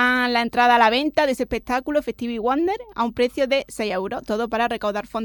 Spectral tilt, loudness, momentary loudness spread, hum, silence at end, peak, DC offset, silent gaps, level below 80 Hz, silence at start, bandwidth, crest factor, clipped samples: -4 dB/octave; -21 LUFS; 9 LU; none; 0 s; -4 dBFS; under 0.1%; none; -48 dBFS; 0 s; 17.5 kHz; 18 dB; under 0.1%